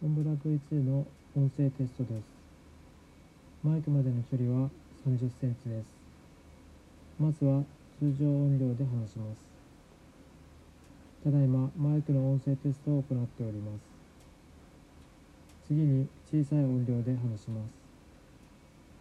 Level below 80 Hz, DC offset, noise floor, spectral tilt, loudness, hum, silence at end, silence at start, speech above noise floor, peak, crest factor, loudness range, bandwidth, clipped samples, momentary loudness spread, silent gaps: -62 dBFS; under 0.1%; -56 dBFS; -10.5 dB/octave; -31 LUFS; none; 1.3 s; 0 s; 26 dB; -18 dBFS; 14 dB; 4 LU; 8 kHz; under 0.1%; 13 LU; none